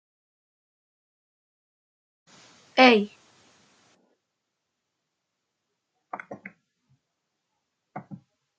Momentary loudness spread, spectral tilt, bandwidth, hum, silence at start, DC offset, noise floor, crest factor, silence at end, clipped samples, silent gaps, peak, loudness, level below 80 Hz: 27 LU; -4.5 dB/octave; 8.2 kHz; none; 2.75 s; under 0.1%; -82 dBFS; 28 dB; 0.45 s; under 0.1%; none; -2 dBFS; -19 LUFS; -82 dBFS